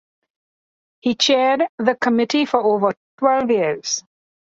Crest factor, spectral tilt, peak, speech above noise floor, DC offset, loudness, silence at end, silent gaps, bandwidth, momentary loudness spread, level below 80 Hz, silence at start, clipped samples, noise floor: 18 dB; -3 dB/octave; -2 dBFS; over 72 dB; under 0.1%; -19 LUFS; 0.6 s; 1.69-1.78 s, 2.97-3.18 s; 7.8 kHz; 8 LU; -66 dBFS; 1.05 s; under 0.1%; under -90 dBFS